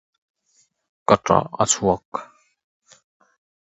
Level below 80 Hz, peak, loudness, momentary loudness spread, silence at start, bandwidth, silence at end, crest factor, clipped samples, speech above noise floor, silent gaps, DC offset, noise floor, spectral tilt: -52 dBFS; 0 dBFS; -20 LUFS; 15 LU; 1.1 s; 8.4 kHz; 1.45 s; 24 dB; under 0.1%; 45 dB; 2.05-2.12 s; under 0.1%; -64 dBFS; -4 dB/octave